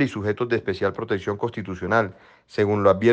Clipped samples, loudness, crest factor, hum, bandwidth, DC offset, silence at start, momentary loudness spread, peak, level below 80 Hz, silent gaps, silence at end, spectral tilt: under 0.1%; -24 LUFS; 18 dB; none; 8.6 kHz; under 0.1%; 0 s; 11 LU; -4 dBFS; -58 dBFS; none; 0 s; -7.5 dB/octave